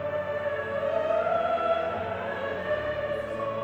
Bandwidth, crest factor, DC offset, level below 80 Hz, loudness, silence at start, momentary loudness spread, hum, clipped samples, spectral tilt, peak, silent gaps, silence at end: over 20 kHz; 14 dB; under 0.1%; -56 dBFS; -29 LUFS; 0 s; 6 LU; none; under 0.1%; -6.5 dB/octave; -14 dBFS; none; 0 s